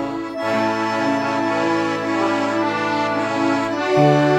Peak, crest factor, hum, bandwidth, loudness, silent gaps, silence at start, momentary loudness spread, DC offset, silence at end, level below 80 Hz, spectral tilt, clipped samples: -2 dBFS; 16 dB; none; 13.5 kHz; -19 LUFS; none; 0 s; 4 LU; under 0.1%; 0 s; -56 dBFS; -6 dB/octave; under 0.1%